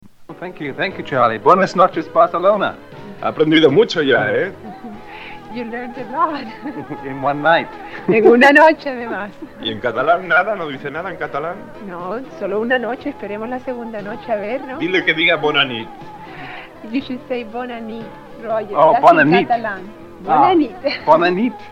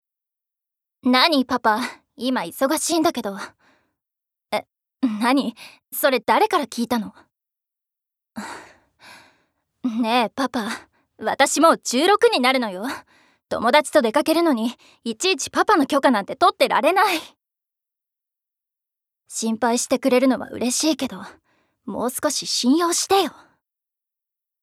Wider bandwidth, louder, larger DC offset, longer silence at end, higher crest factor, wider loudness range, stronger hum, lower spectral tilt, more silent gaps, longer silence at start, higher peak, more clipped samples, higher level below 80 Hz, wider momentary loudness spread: second, 11 kHz vs 16 kHz; first, -16 LUFS vs -20 LUFS; neither; second, 0 s vs 1.35 s; about the same, 18 dB vs 20 dB; about the same, 9 LU vs 7 LU; neither; first, -6 dB/octave vs -2.5 dB/octave; neither; second, 0.05 s vs 1.05 s; about the same, 0 dBFS vs -2 dBFS; neither; first, -50 dBFS vs -68 dBFS; first, 20 LU vs 15 LU